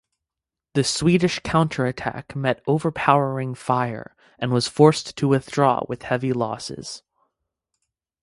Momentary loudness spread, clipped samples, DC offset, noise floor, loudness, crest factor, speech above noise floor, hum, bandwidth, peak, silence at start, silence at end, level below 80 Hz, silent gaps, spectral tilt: 13 LU; under 0.1%; under 0.1%; -88 dBFS; -22 LUFS; 22 dB; 66 dB; none; 11.5 kHz; 0 dBFS; 0.75 s; 1.25 s; -54 dBFS; none; -5.5 dB/octave